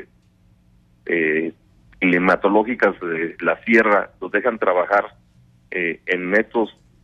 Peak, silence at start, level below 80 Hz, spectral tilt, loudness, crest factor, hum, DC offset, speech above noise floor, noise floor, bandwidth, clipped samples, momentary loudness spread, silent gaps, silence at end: -4 dBFS; 0 s; -58 dBFS; -7 dB/octave; -19 LUFS; 18 dB; none; under 0.1%; 37 dB; -56 dBFS; 8.2 kHz; under 0.1%; 9 LU; none; 0.35 s